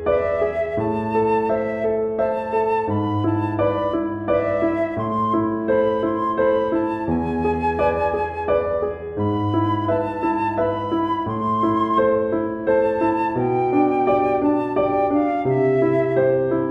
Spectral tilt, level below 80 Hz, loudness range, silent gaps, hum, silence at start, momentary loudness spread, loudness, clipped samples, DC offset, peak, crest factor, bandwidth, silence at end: -9.5 dB/octave; -46 dBFS; 2 LU; none; none; 0 s; 4 LU; -21 LUFS; under 0.1%; under 0.1%; -6 dBFS; 14 dB; 5.6 kHz; 0 s